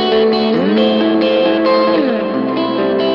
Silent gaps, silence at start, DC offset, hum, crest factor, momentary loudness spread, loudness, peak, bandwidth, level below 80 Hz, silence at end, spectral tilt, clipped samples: none; 0 s; under 0.1%; none; 12 dB; 4 LU; -13 LUFS; -2 dBFS; 6.6 kHz; -54 dBFS; 0 s; -7.5 dB/octave; under 0.1%